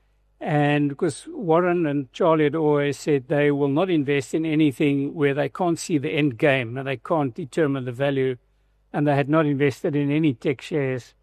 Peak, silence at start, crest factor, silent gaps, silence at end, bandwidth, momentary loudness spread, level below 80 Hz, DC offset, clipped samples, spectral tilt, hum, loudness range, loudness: -6 dBFS; 0.4 s; 16 dB; none; 0.2 s; 13 kHz; 7 LU; -62 dBFS; under 0.1%; under 0.1%; -7 dB/octave; none; 2 LU; -22 LUFS